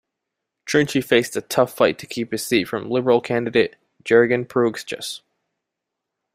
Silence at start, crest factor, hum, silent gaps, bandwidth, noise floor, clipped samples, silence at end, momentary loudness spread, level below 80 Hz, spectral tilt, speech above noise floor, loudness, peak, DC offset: 0.65 s; 20 dB; none; none; 16 kHz; -82 dBFS; under 0.1%; 1.15 s; 12 LU; -60 dBFS; -4.5 dB/octave; 62 dB; -20 LUFS; -2 dBFS; under 0.1%